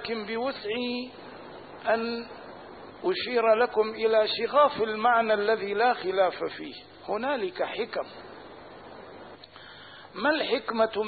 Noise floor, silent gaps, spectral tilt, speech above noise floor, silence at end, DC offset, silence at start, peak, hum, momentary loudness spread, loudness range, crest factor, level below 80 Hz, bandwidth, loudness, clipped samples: -48 dBFS; none; -8 dB/octave; 21 dB; 0 s; under 0.1%; 0 s; -10 dBFS; none; 22 LU; 10 LU; 18 dB; -68 dBFS; 4.8 kHz; -27 LUFS; under 0.1%